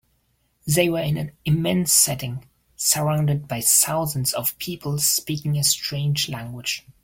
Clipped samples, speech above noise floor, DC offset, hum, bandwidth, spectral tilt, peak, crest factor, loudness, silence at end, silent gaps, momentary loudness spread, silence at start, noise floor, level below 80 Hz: under 0.1%; 45 dB; under 0.1%; none; 17 kHz; -3.5 dB/octave; -2 dBFS; 20 dB; -21 LUFS; 0.15 s; none; 12 LU; 0.65 s; -67 dBFS; -54 dBFS